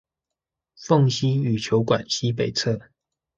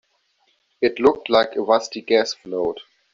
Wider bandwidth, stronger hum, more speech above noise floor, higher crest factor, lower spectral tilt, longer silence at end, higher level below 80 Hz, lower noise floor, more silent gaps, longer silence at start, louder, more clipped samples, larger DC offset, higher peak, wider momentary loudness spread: about the same, 7.6 kHz vs 7.6 kHz; neither; first, 65 dB vs 46 dB; about the same, 18 dB vs 18 dB; first, -5.5 dB/octave vs -3.5 dB/octave; first, 0.6 s vs 0.3 s; about the same, -58 dBFS vs -58 dBFS; first, -86 dBFS vs -65 dBFS; neither; about the same, 0.8 s vs 0.8 s; about the same, -22 LUFS vs -20 LUFS; neither; neither; second, -6 dBFS vs -2 dBFS; about the same, 7 LU vs 8 LU